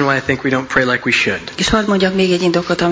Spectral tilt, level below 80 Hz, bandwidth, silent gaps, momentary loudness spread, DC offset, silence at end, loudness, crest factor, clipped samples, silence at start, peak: -4.5 dB/octave; -38 dBFS; 8 kHz; none; 3 LU; under 0.1%; 0 s; -15 LUFS; 14 dB; under 0.1%; 0 s; 0 dBFS